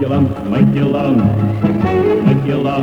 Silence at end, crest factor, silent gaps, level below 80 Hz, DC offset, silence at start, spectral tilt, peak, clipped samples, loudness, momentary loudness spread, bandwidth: 0 s; 12 dB; none; -38 dBFS; under 0.1%; 0 s; -9.5 dB/octave; 0 dBFS; under 0.1%; -14 LUFS; 3 LU; 6.6 kHz